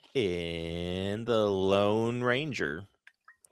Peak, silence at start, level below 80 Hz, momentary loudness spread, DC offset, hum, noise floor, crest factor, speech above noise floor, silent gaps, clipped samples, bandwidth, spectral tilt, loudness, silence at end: -12 dBFS; 0.15 s; -58 dBFS; 9 LU; under 0.1%; none; -61 dBFS; 18 dB; 32 dB; none; under 0.1%; 12.5 kHz; -6 dB/octave; -30 LUFS; 0.2 s